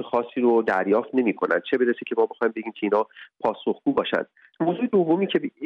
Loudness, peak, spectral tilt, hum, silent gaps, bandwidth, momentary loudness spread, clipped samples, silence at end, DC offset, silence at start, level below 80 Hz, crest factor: -24 LUFS; -8 dBFS; -8 dB/octave; none; none; 5.6 kHz; 7 LU; under 0.1%; 0 s; under 0.1%; 0 s; -70 dBFS; 14 dB